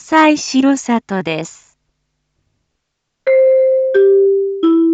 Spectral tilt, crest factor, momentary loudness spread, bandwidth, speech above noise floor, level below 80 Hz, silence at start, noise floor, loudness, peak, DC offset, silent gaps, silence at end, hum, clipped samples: -4.5 dB/octave; 14 dB; 11 LU; 8.4 kHz; 58 dB; -64 dBFS; 0.1 s; -73 dBFS; -13 LUFS; 0 dBFS; under 0.1%; none; 0 s; none; under 0.1%